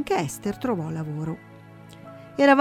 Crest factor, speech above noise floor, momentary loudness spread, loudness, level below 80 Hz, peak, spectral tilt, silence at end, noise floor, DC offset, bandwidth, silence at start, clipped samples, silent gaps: 22 dB; 18 dB; 24 LU; -26 LUFS; -58 dBFS; -2 dBFS; -6 dB/octave; 0 s; -45 dBFS; under 0.1%; 15.5 kHz; 0 s; under 0.1%; none